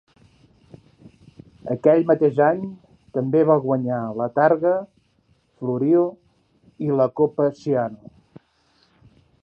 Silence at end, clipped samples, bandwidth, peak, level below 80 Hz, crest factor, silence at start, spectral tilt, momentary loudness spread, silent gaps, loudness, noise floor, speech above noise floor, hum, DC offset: 1.45 s; under 0.1%; 7 kHz; -2 dBFS; -64 dBFS; 20 dB; 1.05 s; -10 dB/octave; 12 LU; none; -21 LUFS; -63 dBFS; 43 dB; none; under 0.1%